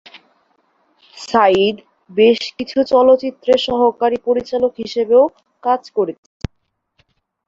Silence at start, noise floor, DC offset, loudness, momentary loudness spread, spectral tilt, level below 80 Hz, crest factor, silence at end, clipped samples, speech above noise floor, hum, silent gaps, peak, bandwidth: 0.15 s; -67 dBFS; under 0.1%; -16 LUFS; 15 LU; -5.5 dB/octave; -50 dBFS; 16 dB; 1.35 s; under 0.1%; 52 dB; none; none; -2 dBFS; 7.8 kHz